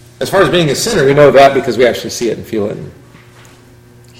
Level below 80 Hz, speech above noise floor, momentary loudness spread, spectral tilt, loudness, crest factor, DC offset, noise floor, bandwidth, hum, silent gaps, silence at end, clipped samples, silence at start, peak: -42 dBFS; 30 dB; 13 LU; -4.5 dB/octave; -11 LUFS; 12 dB; under 0.1%; -40 dBFS; 16.5 kHz; none; none; 1.3 s; 0.9%; 0.2 s; 0 dBFS